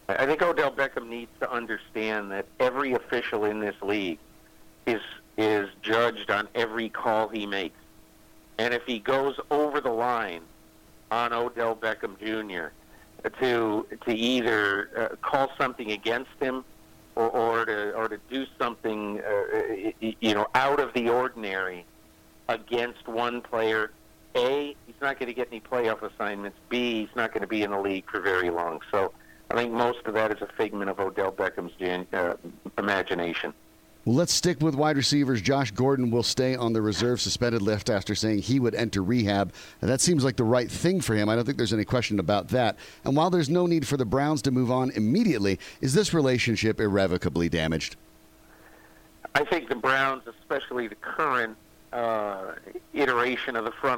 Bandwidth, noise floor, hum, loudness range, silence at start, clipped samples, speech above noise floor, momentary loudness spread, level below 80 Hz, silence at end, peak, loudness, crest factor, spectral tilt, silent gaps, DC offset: 17 kHz; -55 dBFS; none; 5 LU; 0.1 s; under 0.1%; 28 dB; 9 LU; -56 dBFS; 0 s; -6 dBFS; -27 LUFS; 20 dB; -5 dB/octave; none; under 0.1%